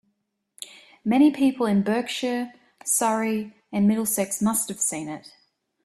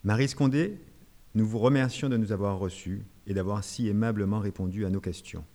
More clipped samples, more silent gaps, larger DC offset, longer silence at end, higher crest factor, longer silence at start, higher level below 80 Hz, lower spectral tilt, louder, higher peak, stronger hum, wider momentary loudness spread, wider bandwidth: neither; neither; neither; first, 0.65 s vs 0.1 s; about the same, 16 dB vs 18 dB; first, 0.6 s vs 0.05 s; second, -66 dBFS vs -54 dBFS; second, -4 dB/octave vs -7 dB/octave; first, -23 LUFS vs -29 LUFS; about the same, -8 dBFS vs -10 dBFS; neither; first, 18 LU vs 12 LU; first, 15 kHz vs 13.5 kHz